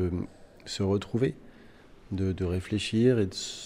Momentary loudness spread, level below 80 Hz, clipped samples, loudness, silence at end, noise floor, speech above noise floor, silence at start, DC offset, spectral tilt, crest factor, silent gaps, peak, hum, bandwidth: 15 LU; -56 dBFS; under 0.1%; -29 LUFS; 0 s; -52 dBFS; 24 dB; 0 s; under 0.1%; -6 dB/octave; 18 dB; none; -12 dBFS; none; 14.5 kHz